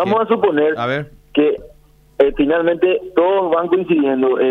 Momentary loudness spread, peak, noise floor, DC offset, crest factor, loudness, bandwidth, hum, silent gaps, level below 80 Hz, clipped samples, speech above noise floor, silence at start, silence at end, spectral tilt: 6 LU; 0 dBFS; -48 dBFS; under 0.1%; 16 dB; -16 LUFS; 5.8 kHz; none; none; -44 dBFS; under 0.1%; 33 dB; 0 s; 0 s; -8 dB/octave